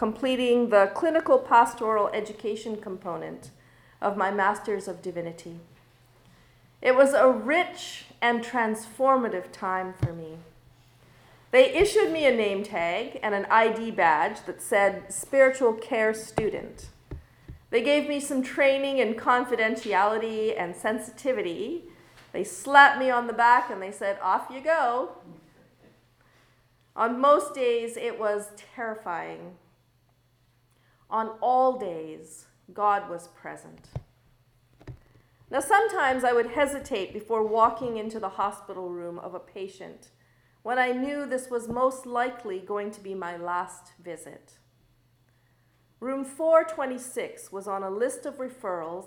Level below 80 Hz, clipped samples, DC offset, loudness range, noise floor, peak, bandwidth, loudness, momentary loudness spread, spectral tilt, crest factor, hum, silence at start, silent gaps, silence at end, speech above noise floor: -58 dBFS; under 0.1%; under 0.1%; 9 LU; -65 dBFS; -2 dBFS; 19.5 kHz; -25 LUFS; 19 LU; -4 dB/octave; 24 dB; none; 0 s; none; 0 s; 40 dB